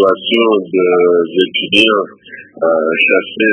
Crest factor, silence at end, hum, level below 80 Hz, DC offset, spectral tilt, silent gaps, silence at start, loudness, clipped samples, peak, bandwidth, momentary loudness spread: 12 dB; 0 s; none; -60 dBFS; under 0.1%; -5 dB/octave; none; 0 s; -12 LUFS; 0.1%; 0 dBFS; 11 kHz; 6 LU